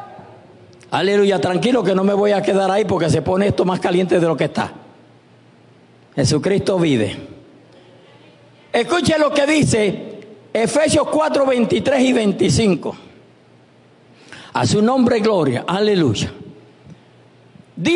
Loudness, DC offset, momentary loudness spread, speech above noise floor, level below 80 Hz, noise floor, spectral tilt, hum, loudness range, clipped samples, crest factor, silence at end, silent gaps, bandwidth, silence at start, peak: -17 LUFS; under 0.1%; 10 LU; 33 dB; -52 dBFS; -49 dBFS; -5.5 dB/octave; none; 4 LU; under 0.1%; 14 dB; 0 s; none; 11 kHz; 0 s; -4 dBFS